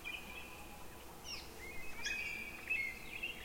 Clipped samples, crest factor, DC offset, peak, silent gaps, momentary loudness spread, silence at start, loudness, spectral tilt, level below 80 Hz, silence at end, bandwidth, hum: under 0.1%; 16 dB; under 0.1%; -28 dBFS; none; 14 LU; 0 s; -43 LUFS; -2 dB/octave; -60 dBFS; 0 s; 16.5 kHz; none